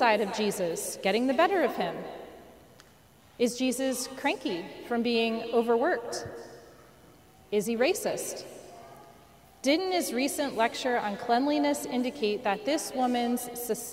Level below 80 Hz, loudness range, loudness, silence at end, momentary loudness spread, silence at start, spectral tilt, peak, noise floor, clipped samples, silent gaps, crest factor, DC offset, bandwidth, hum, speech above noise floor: -66 dBFS; 4 LU; -29 LUFS; 0 s; 13 LU; 0 s; -3.5 dB/octave; -10 dBFS; -58 dBFS; under 0.1%; none; 20 dB; under 0.1%; 16 kHz; none; 29 dB